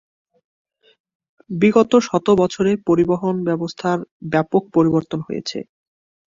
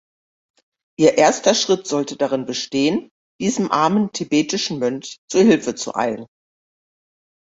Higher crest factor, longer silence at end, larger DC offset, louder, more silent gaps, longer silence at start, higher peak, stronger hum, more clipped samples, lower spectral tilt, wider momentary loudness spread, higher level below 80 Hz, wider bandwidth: about the same, 18 dB vs 18 dB; second, 0.7 s vs 1.3 s; neither; about the same, -18 LUFS vs -19 LUFS; second, 4.11-4.20 s vs 3.11-3.39 s, 5.18-5.28 s; first, 1.5 s vs 1 s; about the same, -2 dBFS vs -2 dBFS; neither; neither; first, -6.5 dB/octave vs -4 dB/octave; about the same, 11 LU vs 10 LU; first, -54 dBFS vs -60 dBFS; about the same, 7.6 kHz vs 8 kHz